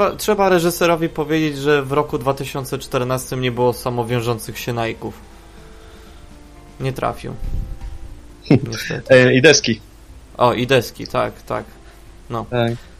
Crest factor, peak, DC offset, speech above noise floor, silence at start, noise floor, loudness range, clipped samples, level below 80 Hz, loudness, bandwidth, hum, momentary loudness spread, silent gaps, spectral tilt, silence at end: 20 dB; 0 dBFS; under 0.1%; 23 dB; 0 s; -41 dBFS; 12 LU; under 0.1%; -36 dBFS; -18 LUFS; 15.5 kHz; none; 17 LU; none; -5 dB/octave; 0.05 s